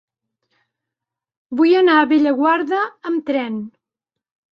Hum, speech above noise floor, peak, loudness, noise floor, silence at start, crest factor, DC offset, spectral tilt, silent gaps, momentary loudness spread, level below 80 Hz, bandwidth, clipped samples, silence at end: none; 69 dB; -4 dBFS; -16 LUFS; -85 dBFS; 1.5 s; 16 dB; under 0.1%; -6.5 dB/octave; none; 14 LU; -68 dBFS; 5.8 kHz; under 0.1%; 0.85 s